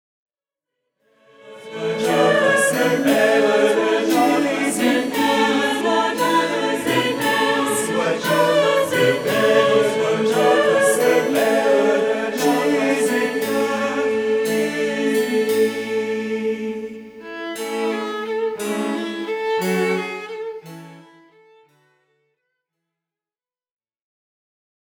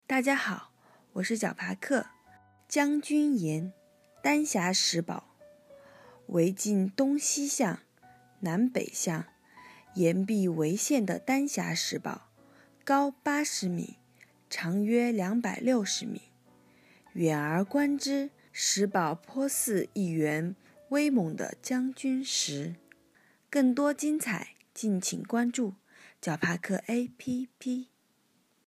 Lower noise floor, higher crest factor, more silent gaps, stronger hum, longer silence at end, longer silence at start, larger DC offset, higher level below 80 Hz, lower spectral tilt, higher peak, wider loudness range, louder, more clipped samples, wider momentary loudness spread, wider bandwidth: first, under -90 dBFS vs -70 dBFS; about the same, 16 dB vs 18 dB; neither; neither; first, 4 s vs 0.85 s; first, 1.45 s vs 0.1 s; neither; first, -64 dBFS vs -80 dBFS; about the same, -4 dB/octave vs -4 dB/octave; first, -4 dBFS vs -12 dBFS; first, 8 LU vs 2 LU; first, -19 LUFS vs -30 LUFS; neither; about the same, 10 LU vs 11 LU; first, 19.5 kHz vs 15.5 kHz